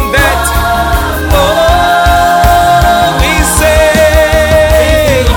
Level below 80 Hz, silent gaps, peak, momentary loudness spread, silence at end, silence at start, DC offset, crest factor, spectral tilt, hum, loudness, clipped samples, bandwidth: -14 dBFS; none; 0 dBFS; 4 LU; 0 s; 0 s; under 0.1%; 8 dB; -4 dB/octave; none; -7 LUFS; 1%; 19.5 kHz